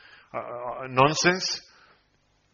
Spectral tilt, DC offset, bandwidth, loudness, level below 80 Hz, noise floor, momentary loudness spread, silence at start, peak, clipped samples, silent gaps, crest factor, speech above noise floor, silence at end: -2.5 dB/octave; under 0.1%; 7.2 kHz; -25 LUFS; -60 dBFS; -67 dBFS; 16 LU; 0.35 s; -6 dBFS; under 0.1%; none; 22 dB; 42 dB; 0.9 s